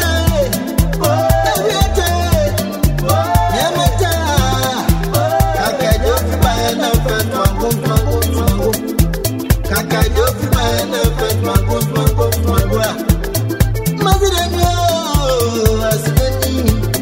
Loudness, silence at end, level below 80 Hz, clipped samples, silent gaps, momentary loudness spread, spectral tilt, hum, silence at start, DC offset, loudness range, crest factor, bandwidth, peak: -15 LUFS; 0 s; -20 dBFS; under 0.1%; none; 3 LU; -5 dB/octave; none; 0 s; under 0.1%; 1 LU; 14 dB; 16.5 kHz; 0 dBFS